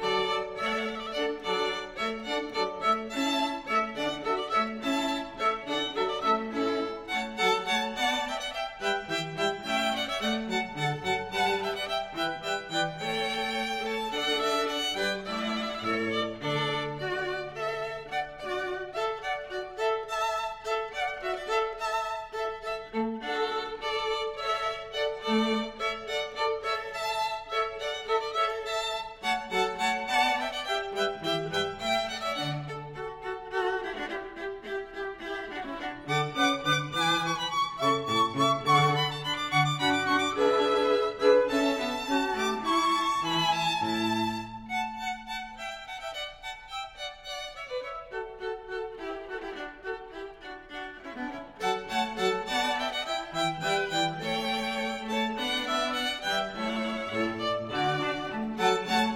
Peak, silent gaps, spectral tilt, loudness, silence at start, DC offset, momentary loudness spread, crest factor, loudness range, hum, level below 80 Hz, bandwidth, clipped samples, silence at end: -10 dBFS; none; -4 dB/octave; -29 LUFS; 0 s; under 0.1%; 11 LU; 20 dB; 9 LU; none; -58 dBFS; 16.5 kHz; under 0.1%; 0 s